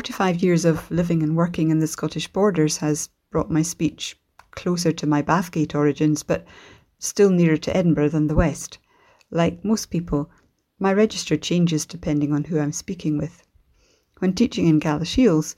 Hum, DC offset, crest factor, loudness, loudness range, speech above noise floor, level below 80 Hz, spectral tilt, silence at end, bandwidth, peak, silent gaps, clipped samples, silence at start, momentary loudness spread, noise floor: none; under 0.1%; 18 dB; -22 LUFS; 3 LU; 41 dB; -42 dBFS; -6 dB/octave; 0.05 s; 15.5 kHz; -4 dBFS; none; under 0.1%; 0 s; 8 LU; -61 dBFS